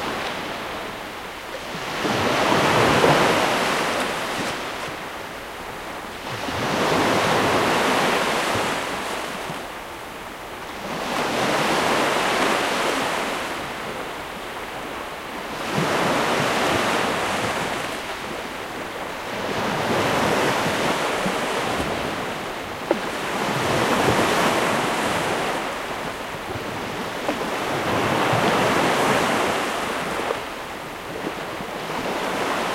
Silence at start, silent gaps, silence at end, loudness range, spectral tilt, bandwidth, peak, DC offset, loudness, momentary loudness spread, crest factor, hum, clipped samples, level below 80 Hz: 0 s; none; 0 s; 5 LU; -3.5 dB/octave; 16 kHz; -4 dBFS; under 0.1%; -23 LUFS; 12 LU; 20 dB; none; under 0.1%; -50 dBFS